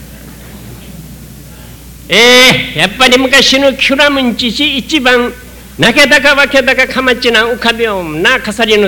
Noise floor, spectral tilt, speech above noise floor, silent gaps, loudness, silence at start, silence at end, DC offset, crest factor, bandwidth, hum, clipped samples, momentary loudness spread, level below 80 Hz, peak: -31 dBFS; -2.5 dB/octave; 22 dB; none; -7 LUFS; 0 s; 0 s; under 0.1%; 10 dB; 18.5 kHz; none; 0.7%; 7 LU; -34 dBFS; 0 dBFS